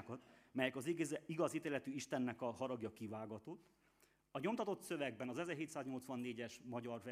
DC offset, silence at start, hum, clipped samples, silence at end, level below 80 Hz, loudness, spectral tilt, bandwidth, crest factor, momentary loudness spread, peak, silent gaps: under 0.1%; 0 s; none; under 0.1%; 0 s; -84 dBFS; -45 LUFS; -5 dB/octave; 15.5 kHz; 22 dB; 10 LU; -24 dBFS; none